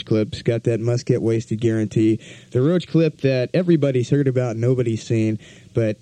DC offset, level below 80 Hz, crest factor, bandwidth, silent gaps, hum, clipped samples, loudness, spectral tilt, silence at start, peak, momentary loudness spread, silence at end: under 0.1%; -56 dBFS; 14 dB; 9.6 kHz; none; none; under 0.1%; -20 LUFS; -7.5 dB/octave; 0 s; -4 dBFS; 5 LU; 0.1 s